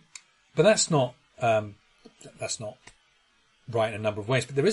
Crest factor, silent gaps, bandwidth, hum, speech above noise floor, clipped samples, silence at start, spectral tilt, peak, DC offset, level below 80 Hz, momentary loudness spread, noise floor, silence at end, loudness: 22 dB; none; 11.5 kHz; none; 40 dB; under 0.1%; 0.55 s; -4 dB/octave; -6 dBFS; under 0.1%; -66 dBFS; 19 LU; -65 dBFS; 0 s; -26 LUFS